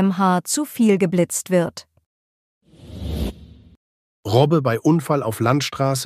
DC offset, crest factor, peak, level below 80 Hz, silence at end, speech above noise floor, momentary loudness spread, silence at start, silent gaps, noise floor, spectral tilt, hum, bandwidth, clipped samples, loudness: under 0.1%; 18 dB; -2 dBFS; -40 dBFS; 0 s; over 72 dB; 13 LU; 0 s; 2.06-2.61 s, 3.77-4.23 s; under -90 dBFS; -5.5 dB/octave; none; 15.5 kHz; under 0.1%; -20 LUFS